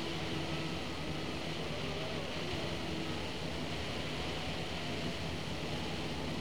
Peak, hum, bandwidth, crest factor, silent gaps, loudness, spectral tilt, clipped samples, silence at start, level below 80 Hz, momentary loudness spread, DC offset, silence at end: -24 dBFS; none; over 20 kHz; 14 dB; none; -38 LUFS; -4.5 dB/octave; under 0.1%; 0 s; -54 dBFS; 1 LU; 0.6%; 0 s